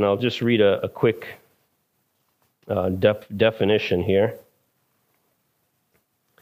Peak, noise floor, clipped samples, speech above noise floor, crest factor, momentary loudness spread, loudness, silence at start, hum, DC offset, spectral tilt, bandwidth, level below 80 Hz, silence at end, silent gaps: -4 dBFS; -70 dBFS; under 0.1%; 50 dB; 20 dB; 9 LU; -22 LUFS; 0 s; none; under 0.1%; -7.5 dB/octave; 15.5 kHz; -60 dBFS; 2 s; none